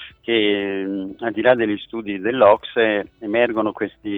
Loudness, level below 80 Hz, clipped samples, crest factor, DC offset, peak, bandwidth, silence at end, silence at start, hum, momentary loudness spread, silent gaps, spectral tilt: -20 LUFS; -58 dBFS; under 0.1%; 18 dB; under 0.1%; 0 dBFS; 4.1 kHz; 0 s; 0 s; none; 11 LU; none; -8 dB/octave